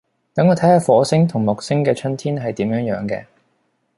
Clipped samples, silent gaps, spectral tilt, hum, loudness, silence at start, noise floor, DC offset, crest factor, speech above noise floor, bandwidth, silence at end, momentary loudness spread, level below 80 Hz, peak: under 0.1%; none; -7 dB/octave; none; -18 LUFS; 0.35 s; -66 dBFS; under 0.1%; 16 dB; 49 dB; 11.5 kHz; 0.75 s; 11 LU; -56 dBFS; -2 dBFS